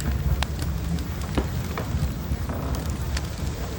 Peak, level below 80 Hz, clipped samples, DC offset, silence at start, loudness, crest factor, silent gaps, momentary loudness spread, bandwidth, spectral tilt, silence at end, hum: -8 dBFS; -30 dBFS; under 0.1%; under 0.1%; 0 s; -28 LUFS; 18 dB; none; 3 LU; 18 kHz; -5.5 dB/octave; 0 s; none